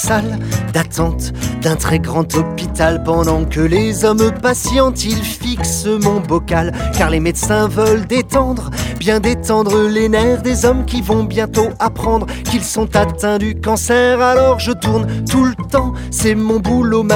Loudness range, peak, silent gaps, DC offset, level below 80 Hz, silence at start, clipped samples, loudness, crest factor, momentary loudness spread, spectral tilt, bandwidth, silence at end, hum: 2 LU; 0 dBFS; none; under 0.1%; -26 dBFS; 0 s; under 0.1%; -15 LUFS; 14 dB; 5 LU; -5 dB/octave; 18.5 kHz; 0 s; none